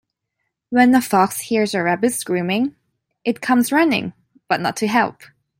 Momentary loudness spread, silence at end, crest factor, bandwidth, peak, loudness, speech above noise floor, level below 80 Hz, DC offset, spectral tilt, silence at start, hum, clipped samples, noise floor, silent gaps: 10 LU; 0.5 s; 16 dB; 16.5 kHz; -2 dBFS; -18 LUFS; 59 dB; -62 dBFS; under 0.1%; -4.5 dB/octave; 0.7 s; none; under 0.1%; -76 dBFS; none